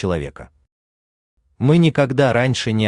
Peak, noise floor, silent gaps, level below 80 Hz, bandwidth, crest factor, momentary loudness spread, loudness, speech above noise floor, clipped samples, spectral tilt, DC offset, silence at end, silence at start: -4 dBFS; under -90 dBFS; 0.72-1.37 s; -48 dBFS; 10.5 kHz; 16 dB; 10 LU; -17 LUFS; over 73 dB; under 0.1%; -6.5 dB/octave; under 0.1%; 0 s; 0 s